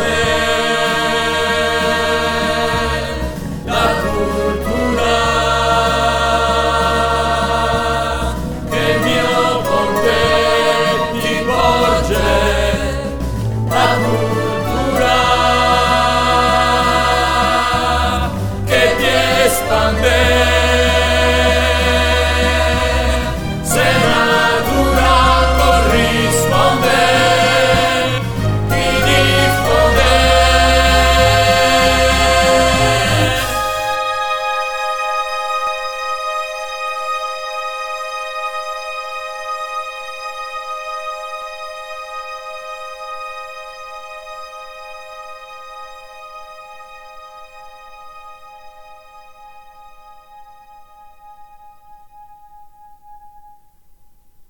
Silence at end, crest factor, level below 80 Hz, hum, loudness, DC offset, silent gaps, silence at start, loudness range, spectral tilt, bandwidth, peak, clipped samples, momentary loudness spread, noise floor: 0 s; 16 dB; -26 dBFS; none; -14 LUFS; 1%; none; 0 s; 15 LU; -4 dB/octave; 18 kHz; 0 dBFS; under 0.1%; 16 LU; -48 dBFS